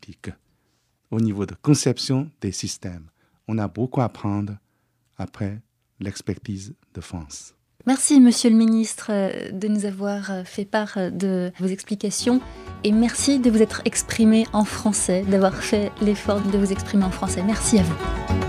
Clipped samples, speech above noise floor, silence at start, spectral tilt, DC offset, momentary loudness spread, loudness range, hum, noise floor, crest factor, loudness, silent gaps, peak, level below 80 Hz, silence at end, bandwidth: under 0.1%; 47 dB; 0.1 s; -5 dB/octave; under 0.1%; 17 LU; 9 LU; none; -68 dBFS; 18 dB; -21 LUFS; none; -4 dBFS; -42 dBFS; 0 s; 14.5 kHz